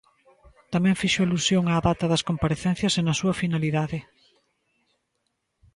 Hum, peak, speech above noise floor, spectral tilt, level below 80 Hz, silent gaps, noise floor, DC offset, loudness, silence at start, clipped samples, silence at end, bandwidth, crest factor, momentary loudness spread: none; -10 dBFS; 53 dB; -5 dB/octave; -48 dBFS; none; -76 dBFS; under 0.1%; -24 LUFS; 0.7 s; under 0.1%; 1.75 s; 11.5 kHz; 16 dB; 5 LU